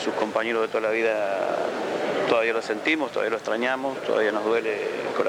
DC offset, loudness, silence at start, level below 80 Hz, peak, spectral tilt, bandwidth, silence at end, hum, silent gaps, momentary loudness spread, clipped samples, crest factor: under 0.1%; -25 LUFS; 0 s; -70 dBFS; -8 dBFS; -4 dB/octave; 14.5 kHz; 0 s; none; none; 5 LU; under 0.1%; 18 dB